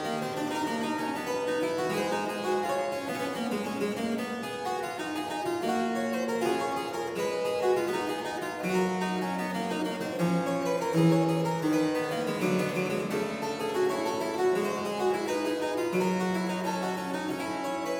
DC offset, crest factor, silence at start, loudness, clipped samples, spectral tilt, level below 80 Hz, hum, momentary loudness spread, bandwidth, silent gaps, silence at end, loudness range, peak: under 0.1%; 16 dB; 0 s; -30 LUFS; under 0.1%; -5.5 dB/octave; -68 dBFS; none; 5 LU; over 20 kHz; none; 0 s; 3 LU; -14 dBFS